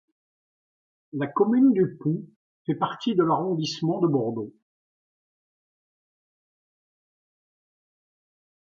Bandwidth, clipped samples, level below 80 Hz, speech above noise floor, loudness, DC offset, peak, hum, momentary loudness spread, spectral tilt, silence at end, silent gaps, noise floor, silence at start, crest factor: 7.2 kHz; under 0.1%; -76 dBFS; over 66 dB; -24 LUFS; under 0.1%; -10 dBFS; none; 14 LU; -7.5 dB/octave; 4.3 s; 2.36-2.65 s; under -90 dBFS; 1.15 s; 18 dB